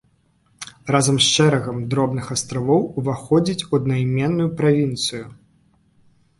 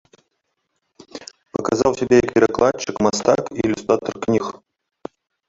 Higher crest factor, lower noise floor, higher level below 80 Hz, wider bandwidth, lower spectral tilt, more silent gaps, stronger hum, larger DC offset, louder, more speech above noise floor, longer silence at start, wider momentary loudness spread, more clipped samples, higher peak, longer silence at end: about the same, 20 dB vs 18 dB; second, -61 dBFS vs -73 dBFS; about the same, -52 dBFS vs -50 dBFS; first, 11.5 kHz vs 8 kHz; about the same, -5 dB/octave vs -5 dB/octave; neither; neither; neither; about the same, -19 LUFS vs -19 LUFS; second, 42 dB vs 55 dB; second, 0.6 s vs 1.15 s; second, 11 LU vs 23 LU; neither; about the same, -2 dBFS vs -2 dBFS; about the same, 1.05 s vs 0.95 s